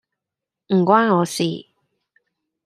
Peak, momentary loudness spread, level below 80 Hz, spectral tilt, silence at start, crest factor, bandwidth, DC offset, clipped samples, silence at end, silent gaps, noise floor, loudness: -2 dBFS; 9 LU; -68 dBFS; -5.5 dB/octave; 0.7 s; 20 dB; 14 kHz; under 0.1%; under 0.1%; 1.05 s; none; -85 dBFS; -18 LUFS